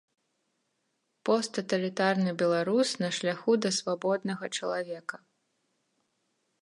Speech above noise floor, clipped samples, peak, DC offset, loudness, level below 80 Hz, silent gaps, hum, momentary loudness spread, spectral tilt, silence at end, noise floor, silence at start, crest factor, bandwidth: 49 dB; under 0.1%; -12 dBFS; under 0.1%; -29 LUFS; -82 dBFS; none; none; 8 LU; -4.5 dB/octave; 1.45 s; -78 dBFS; 1.25 s; 20 dB; 11.5 kHz